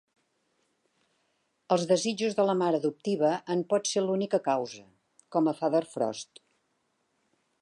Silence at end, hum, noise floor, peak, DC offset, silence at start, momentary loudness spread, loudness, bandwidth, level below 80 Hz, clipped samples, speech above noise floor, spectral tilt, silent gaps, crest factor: 1.4 s; none; -75 dBFS; -12 dBFS; under 0.1%; 1.7 s; 7 LU; -28 LUFS; 11.5 kHz; -82 dBFS; under 0.1%; 48 dB; -5 dB/octave; none; 18 dB